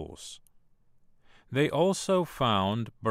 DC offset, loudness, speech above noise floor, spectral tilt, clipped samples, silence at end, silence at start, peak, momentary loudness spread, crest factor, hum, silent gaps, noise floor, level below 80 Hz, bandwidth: under 0.1%; -28 LUFS; 33 dB; -5 dB/octave; under 0.1%; 0 s; 0 s; -12 dBFS; 17 LU; 18 dB; none; none; -61 dBFS; -58 dBFS; 16 kHz